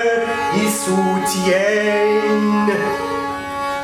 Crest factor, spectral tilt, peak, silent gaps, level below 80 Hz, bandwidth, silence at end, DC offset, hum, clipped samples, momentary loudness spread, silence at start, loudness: 14 dB; -4.5 dB/octave; -4 dBFS; none; -52 dBFS; 18.5 kHz; 0 s; under 0.1%; none; under 0.1%; 7 LU; 0 s; -17 LUFS